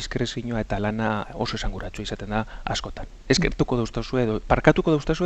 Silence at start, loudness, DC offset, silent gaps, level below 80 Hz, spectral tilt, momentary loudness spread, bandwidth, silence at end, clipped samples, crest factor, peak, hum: 0 s; -25 LUFS; under 0.1%; none; -34 dBFS; -5.5 dB/octave; 13 LU; 8.6 kHz; 0 s; under 0.1%; 22 dB; -2 dBFS; none